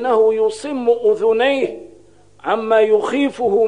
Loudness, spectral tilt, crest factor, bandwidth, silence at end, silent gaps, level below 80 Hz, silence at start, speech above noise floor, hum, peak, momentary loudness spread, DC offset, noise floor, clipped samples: -17 LUFS; -4.5 dB/octave; 14 dB; 10 kHz; 0 s; none; -62 dBFS; 0 s; 33 dB; 50 Hz at -55 dBFS; -2 dBFS; 8 LU; 0.3%; -49 dBFS; under 0.1%